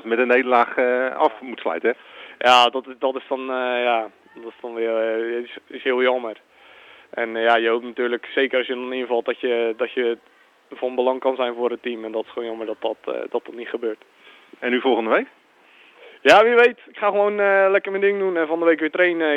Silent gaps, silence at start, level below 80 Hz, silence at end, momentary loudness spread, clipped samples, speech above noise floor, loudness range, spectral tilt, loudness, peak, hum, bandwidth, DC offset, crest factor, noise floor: none; 0.05 s; -72 dBFS; 0 s; 14 LU; under 0.1%; 32 dB; 8 LU; -3.5 dB/octave; -20 LUFS; -4 dBFS; none; 10 kHz; under 0.1%; 18 dB; -53 dBFS